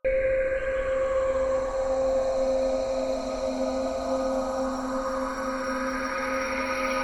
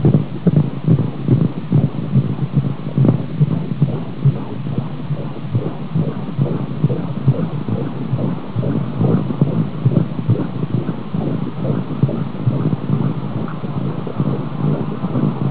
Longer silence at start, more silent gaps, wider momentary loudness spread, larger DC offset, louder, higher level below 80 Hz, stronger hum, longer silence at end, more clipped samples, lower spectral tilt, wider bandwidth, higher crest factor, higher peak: about the same, 0.05 s vs 0 s; neither; about the same, 4 LU vs 6 LU; second, under 0.1% vs 4%; second, -27 LUFS vs -19 LUFS; about the same, -44 dBFS vs -42 dBFS; neither; about the same, 0 s vs 0 s; neither; second, -4.5 dB/octave vs -13 dB/octave; first, 16.5 kHz vs 4 kHz; second, 12 dB vs 18 dB; second, -16 dBFS vs 0 dBFS